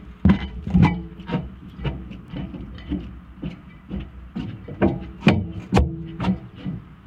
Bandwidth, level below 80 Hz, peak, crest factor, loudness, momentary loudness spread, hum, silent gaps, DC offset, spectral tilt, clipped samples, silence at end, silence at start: 9 kHz; -34 dBFS; -2 dBFS; 22 dB; -24 LUFS; 15 LU; none; none; under 0.1%; -8 dB/octave; under 0.1%; 0.1 s; 0 s